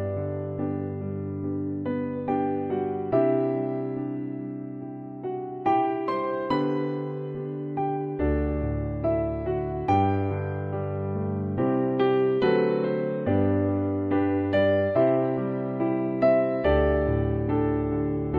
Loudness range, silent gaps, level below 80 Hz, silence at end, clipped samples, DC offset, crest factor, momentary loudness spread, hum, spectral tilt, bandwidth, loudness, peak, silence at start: 5 LU; none; -40 dBFS; 0 s; under 0.1%; under 0.1%; 16 dB; 9 LU; none; -10 dB/octave; 5.2 kHz; -26 LUFS; -10 dBFS; 0 s